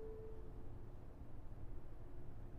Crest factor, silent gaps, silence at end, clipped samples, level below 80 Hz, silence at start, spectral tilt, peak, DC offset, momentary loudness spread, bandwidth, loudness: 12 dB; none; 0 s; under 0.1%; -54 dBFS; 0 s; -9 dB/octave; -36 dBFS; under 0.1%; 4 LU; 3.5 kHz; -57 LUFS